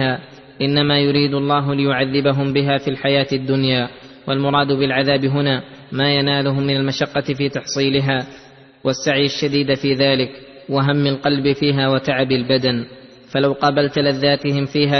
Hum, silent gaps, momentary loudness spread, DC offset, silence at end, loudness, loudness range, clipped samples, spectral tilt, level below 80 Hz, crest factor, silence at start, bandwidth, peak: none; none; 7 LU; under 0.1%; 0 s; -18 LUFS; 2 LU; under 0.1%; -6 dB/octave; -52 dBFS; 16 dB; 0 s; 6.4 kHz; -2 dBFS